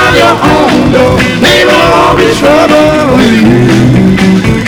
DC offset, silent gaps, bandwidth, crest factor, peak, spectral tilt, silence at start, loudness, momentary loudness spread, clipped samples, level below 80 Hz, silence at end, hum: under 0.1%; none; over 20 kHz; 4 dB; 0 dBFS; -5.5 dB/octave; 0 s; -5 LUFS; 2 LU; 7%; -24 dBFS; 0 s; none